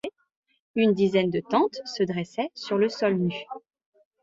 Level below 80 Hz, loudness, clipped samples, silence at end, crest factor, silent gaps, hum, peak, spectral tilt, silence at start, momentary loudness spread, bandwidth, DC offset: -68 dBFS; -25 LUFS; under 0.1%; 0.65 s; 18 dB; 0.36-0.43 s, 0.60-0.74 s; none; -8 dBFS; -6.5 dB/octave; 0.05 s; 14 LU; 7.8 kHz; under 0.1%